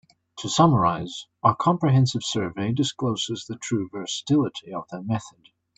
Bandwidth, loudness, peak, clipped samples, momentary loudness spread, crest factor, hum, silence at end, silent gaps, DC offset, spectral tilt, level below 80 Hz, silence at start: 8.8 kHz; -24 LUFS; -4 dBFS; under 0.1%; 12 LU; 20 dB; none; 0.5 s; none; under 0.1%; -5.5 dB/octave; -60 dBFS; 0.35 s